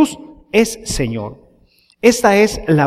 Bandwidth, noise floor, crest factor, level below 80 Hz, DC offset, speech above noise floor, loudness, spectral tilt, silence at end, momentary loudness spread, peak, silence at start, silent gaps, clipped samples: 15.5 kHz; -54 dBFS; 16 dB; -36 dBFS; under 0.1%; 39 dB; -15 LUFS; -5 dB/octave; 0 s; 14 LU; 0 dBFS; 0 s; none; under 0.1%